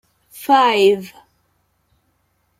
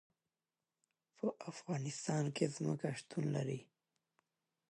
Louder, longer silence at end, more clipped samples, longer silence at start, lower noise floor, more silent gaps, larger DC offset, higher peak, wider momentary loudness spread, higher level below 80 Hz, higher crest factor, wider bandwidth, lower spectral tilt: first, -15 LUFS vs -41 LUFS; first, 1.5 s vs 1.1 s; neither; second, 0.35 s vs 1.25 s; second, -65 dBFS vs under -90 dBFS; neither; neither; first, -2 dBFS vs -20 dBFS; first, 19 LU vs 6 LU; first, -68 dBFS vs -84 dBFS; about the same, 18 dB vs 22 dB; first, 16 kHz vs 11.5 kHz; second, -4 dB/octave vs -6 dB/octave